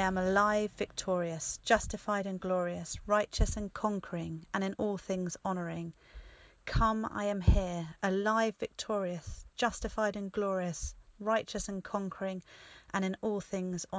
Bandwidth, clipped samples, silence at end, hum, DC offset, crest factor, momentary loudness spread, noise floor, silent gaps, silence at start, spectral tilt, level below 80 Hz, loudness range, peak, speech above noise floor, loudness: 8 kHz; under 0.1%; 0 s; none; under 0.1%; 22 dB; 10 LU; -52 dBFS; none; 0 s; -5 dB/octave; -42 dBFS; 4 LU; -12 dBFS; 19 dB; -34 LUFS